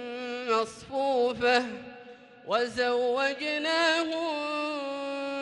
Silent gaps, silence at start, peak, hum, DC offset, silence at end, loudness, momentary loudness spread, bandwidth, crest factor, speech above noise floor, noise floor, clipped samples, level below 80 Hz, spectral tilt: none; 0 s; -10 dBFS; none; under 0.1%; 0 s; -28 LUFS; 11 LU; 11.5 kHz; 18 dB; 22 dB; -49 dBFS; under 0.1%; -68 dBFS; -3 dB/octave